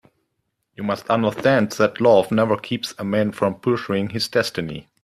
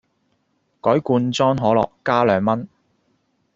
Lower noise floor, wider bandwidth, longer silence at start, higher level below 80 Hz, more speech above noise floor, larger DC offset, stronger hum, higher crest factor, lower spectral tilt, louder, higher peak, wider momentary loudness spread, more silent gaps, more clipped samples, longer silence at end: first, -74 dBFS vs -67 dBFS; first, 14.5 kHz vs 7.8 kHz; about the same, 0.8 s vs 0.85 s; about the same, -58 dBFS vs -56 dBFS; first, 54 dB vs 49 dB; neither; neither; about the same, 18 dB vs 18 dB; about the same, -5.5 dB/octave vs -5.5 dB/octave; about the same, -20 LUFS vs -19 LUFS; about the same, -2 dBFS vs -2 dBFS; first, 10 LU vs 7 LU; neither; neither; second, 0.2 s vs 0.9 s